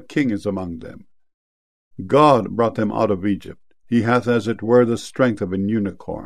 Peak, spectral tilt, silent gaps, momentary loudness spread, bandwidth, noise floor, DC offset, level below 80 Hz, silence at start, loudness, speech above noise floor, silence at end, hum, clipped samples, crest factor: 0 dBFS; -7 dB/octave; 1.34-1.91 s; 13 LU; 12.5 kHz; under -90 dBFS; 0.6%; -54 dBFS; 0.1 s; -19 LUFS; over 71 dB; 0 s; none; under 0.1%; 20 dB